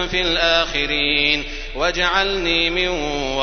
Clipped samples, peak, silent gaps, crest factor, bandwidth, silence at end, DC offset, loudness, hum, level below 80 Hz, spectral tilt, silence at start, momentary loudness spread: under 0.1%; -2 dBFS; none; 18 dB; 6.6 kHz; 0 s; under 0.1%; -18 LUFS; none; -32 dBFS; -3 dB/octave; 0 s; 6 LU